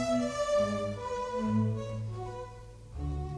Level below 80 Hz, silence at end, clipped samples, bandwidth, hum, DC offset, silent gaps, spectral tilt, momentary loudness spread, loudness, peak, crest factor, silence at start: -46 dBFS; 0 s; under 0.1%; 11 kHz; none; under 0.1%; none; -6.5 dB/octave; 15 LU; -33 LUFS; -18 dBFS; 14 dB; 0 s